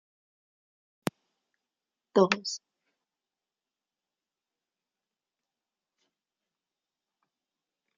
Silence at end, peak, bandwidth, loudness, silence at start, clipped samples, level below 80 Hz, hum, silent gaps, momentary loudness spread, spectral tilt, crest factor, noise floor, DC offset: 5.4 s; -6 dBFS; 7.4 kHz; -29 LUFS; 2.15 s; under 0.1%; -80 dBFS; none; none; 13 LU; -3.5 dB/octave; 32 dB; under -90 dBFS; under 0.1%